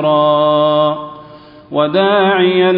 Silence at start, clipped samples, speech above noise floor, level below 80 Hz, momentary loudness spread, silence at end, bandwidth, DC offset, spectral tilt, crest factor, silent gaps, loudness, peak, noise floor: 0 s; under 0.1%; 26 dB; -58 dBFS; 10 LU; 0 s; 5 kHz; under 0.1%; -9.5 dB/octave; 12 dB; none; -12 LUFS; 0 dBFS; -38 dBFS